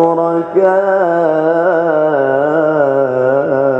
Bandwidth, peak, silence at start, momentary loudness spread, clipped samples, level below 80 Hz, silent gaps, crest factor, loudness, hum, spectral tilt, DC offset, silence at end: 7.4 kHz; 0 dBFS; 0 s; 1 LU; under 0.1%; -62 dBFS; none; 12 dB; -12 LUFS; none; -8.5 dB/octave; under 0.1%; 0 s